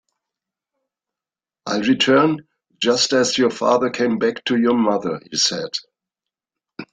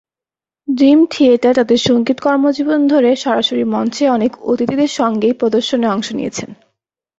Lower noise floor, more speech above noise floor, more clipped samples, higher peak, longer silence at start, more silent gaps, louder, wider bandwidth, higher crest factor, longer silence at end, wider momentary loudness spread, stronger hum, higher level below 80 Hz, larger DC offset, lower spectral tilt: about the same, -90 dBFS vs -89 dBFS; second, 72 dB vs 76 dB; neither; about the same, -4 dBFS vs -2 dBFS; first, 1.65 s vs 0.7 s; neither; second, -18 LUFS vs -14 LUFS; first, 9.6 kHz vs 8 kHz; first, 18 dB vs 12 dB; second, 0.1 s vs 0.65 s; about the same, 12 LU vs 10 LU; neither; second, -64 dBFS vs -56 dBFS; neither; second, -3.5 dB/octave vs -5 dB/octave